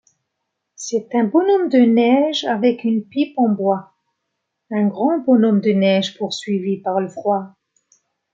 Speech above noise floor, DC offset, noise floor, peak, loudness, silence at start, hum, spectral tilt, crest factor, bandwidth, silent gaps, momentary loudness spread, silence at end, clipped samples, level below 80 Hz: 60 dB; under 0.1%; -77 dBFS; -2 dBFS; -18 LUFS; 0.8 s; none; -6 dB/octave; 16 dB; 7.8 kHz; none; 10 LU; 0.85 s; under 0.1%; -70 dBFS